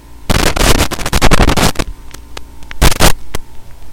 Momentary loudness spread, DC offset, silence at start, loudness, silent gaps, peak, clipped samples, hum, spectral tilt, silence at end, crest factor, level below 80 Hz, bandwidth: 22 LU; under 0.1%; 0 s; -12 LUFS; none; 0 dBFS; under 0.1%; none; -3.5 dB/octave; 0 s; 12 dB; -16 dBFS; 17.5 kHz